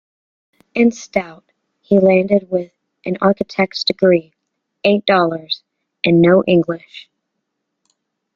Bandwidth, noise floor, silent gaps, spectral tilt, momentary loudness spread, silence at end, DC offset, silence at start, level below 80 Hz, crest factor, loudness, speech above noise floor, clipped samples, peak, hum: 7.2 kHz; -75 dBFS; none; -6.5 dB/octave; 13 LU; 1.35 s; under 0.1%; 0.75 s; -56 dBFS; 16 dB; -16 LUFS; 60 dB; under 0.1%; 0 dBFS; none